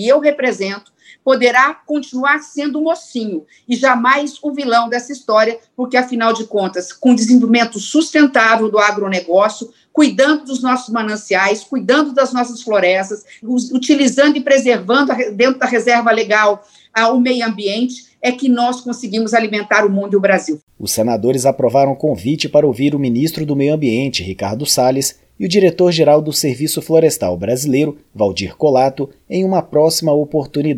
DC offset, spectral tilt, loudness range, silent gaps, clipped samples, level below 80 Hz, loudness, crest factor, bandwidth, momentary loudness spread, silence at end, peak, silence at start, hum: under 0.1%; -4.5 dB/octave; 3 LU; 20.63-20.67 s; under 0.1%; -56 dBFS; -15 LUFS; 14 dB; 16.5 kHz; 10 LU; 0 s; 0 dBFS; 0 s; none